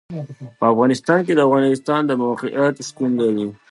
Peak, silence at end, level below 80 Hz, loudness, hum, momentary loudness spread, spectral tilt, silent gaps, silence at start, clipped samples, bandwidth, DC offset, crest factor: -2 dBFS; 0.15 s; -66 dBFS; -18 LUFS; none; 9 LU; -6 dB/octave; none; 0.1 s; under 0.1%; 11.5 kHz; under 0.1%; 16 dB